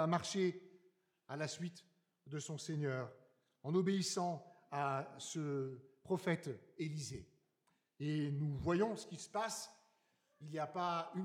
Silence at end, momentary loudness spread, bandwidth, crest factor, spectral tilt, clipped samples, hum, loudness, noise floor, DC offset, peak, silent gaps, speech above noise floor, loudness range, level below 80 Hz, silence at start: 0 s; 13 LU; 15.5 kHz; 20 dB; -5.5 dB/octave; under 0.1%; none; -41 LUFS; -82 dBFS; under 0.1%; -22 dBFS; none; 41 dB; 3 LU; -74 dBFS; 0 s